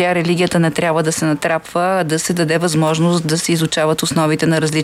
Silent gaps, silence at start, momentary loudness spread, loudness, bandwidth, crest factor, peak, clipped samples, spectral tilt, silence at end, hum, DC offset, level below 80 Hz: none; 0 s; 2 LU; -16 LUFS; 16 kHz; 12 dB; -2 dBFS; under 0.1%; -5 dB/octave; 0 s; none; under 0.1%; -52 dBFS